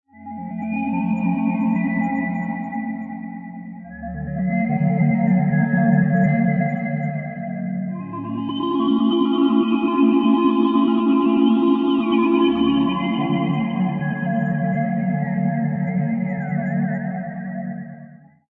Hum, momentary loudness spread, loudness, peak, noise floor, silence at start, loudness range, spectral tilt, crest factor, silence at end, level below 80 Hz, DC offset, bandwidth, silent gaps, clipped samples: none; 12 LU; -20 LUFS; -6 dBFS; -43 dBFS; 0.15 s; 7 LU; -10.5 dB/octave; 14 dB; 0.35 s; -54 dBFS; under 0.1%; 4 kHz; none; under 0.1%